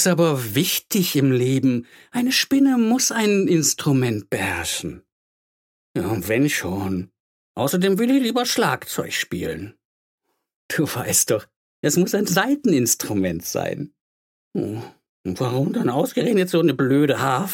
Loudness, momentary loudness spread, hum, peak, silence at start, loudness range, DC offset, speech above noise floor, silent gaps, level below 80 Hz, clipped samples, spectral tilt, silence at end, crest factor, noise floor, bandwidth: -20 LUFS; 11 LU; none; -2 dBFS; 0 s; 5 LU; under 0.1%; over 70 dB; 5.12-5.94 s, 7.20-7.55 s, 9.85-10.18 s, 10.56-10.69 s, 11.56-11.83 s, 14.01-14.51 s, 15.09-15.24 s; -56 dBFS; under 0.1%; -4.5 dB/octave; 0 s; 18 dB; under -90 dBFS; 17 kHz